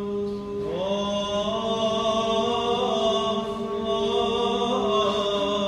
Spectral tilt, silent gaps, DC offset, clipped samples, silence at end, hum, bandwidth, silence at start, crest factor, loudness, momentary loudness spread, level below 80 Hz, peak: -4.5 dB/octave; none; under 0.1%; under 0.1%; 0 s; none; 10.5 kHz; 0 s; 14 dB; -25 LUFS; 6 LU; -50 dBFS; -10 dBFS